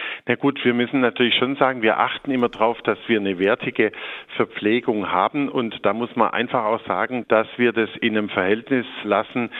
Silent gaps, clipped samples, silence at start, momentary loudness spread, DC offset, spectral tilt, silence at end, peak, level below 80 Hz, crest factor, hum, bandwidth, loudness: none; under 0.1%; 0 s; 5 LU; under 0.1%; -7.5 dB/octave; 0 s; -2 dBFS; -66 dBFS; 20 dB; none; 4.2 kHz; -21 LUFS